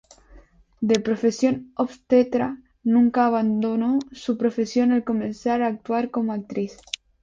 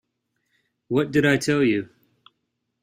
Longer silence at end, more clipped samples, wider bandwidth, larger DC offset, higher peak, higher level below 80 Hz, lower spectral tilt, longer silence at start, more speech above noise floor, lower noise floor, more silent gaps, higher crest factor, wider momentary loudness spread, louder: second, 0.5 s vs 0.95 s; neither; second, 7.6 kHz vs 15.5 kHz; neither; first, -2 dBFS vs -6 dBFS; about the same, -58 dBFS vs -60 dBFS; about the same, -6 dB/octave vs -5.5 dB/octave; second, 0.35 s vs 0.9 s; second, 29 dB vs 56 dB; second, -51 dBFS vs -77 dBFS; neither; about the same, 20 dB vs 20 dB; about the same, 10 LU vs 8 LU; about the same, -23 LUFS vs -21 LUFS